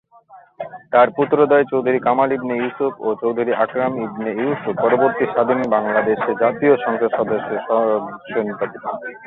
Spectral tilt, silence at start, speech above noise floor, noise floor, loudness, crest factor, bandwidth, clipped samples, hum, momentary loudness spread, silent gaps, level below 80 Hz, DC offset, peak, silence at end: -9 dB/octave; 0.3 s; 28 dB; -46 dBFS; -18 LUFS; 16 dB; 4.1 kHz; under 0.1%; none; 9 LU; none; -64 dBFS; under 0.1%; -2 dBFS; 0 s